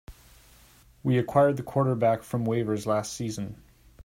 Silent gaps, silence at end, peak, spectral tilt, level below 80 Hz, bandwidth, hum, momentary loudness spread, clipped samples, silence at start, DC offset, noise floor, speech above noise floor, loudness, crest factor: none; 0 s; -8 dBFS; -7 dB/octave; -56 dBFS; 16 kHz; none; 11 LU; under 0.1%; 0.1 s; under 0.1%; -56 dBFS; 31 dB; -27 LUFS; 20 dB